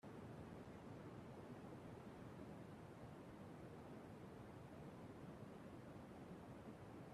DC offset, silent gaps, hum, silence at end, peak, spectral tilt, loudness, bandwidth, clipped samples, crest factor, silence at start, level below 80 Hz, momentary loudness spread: under 0.1%; none; none; 0 s; -42 dBFS; -7 dB/octave; -58 LUFS; 14 kHz; under 0.1%; 14 dB; 0.05 s; -74 dBFS; 1 LU